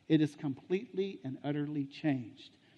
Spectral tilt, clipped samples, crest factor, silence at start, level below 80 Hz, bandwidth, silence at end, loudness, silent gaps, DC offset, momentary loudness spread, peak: -8 dB/octave; under 0.1%; 20 dB; 0.1 s; -78 dBFS; 9.4 kHz; 0.3 s; -36 LUFS; none; under 0.1%; 10 LU; -16 dBFS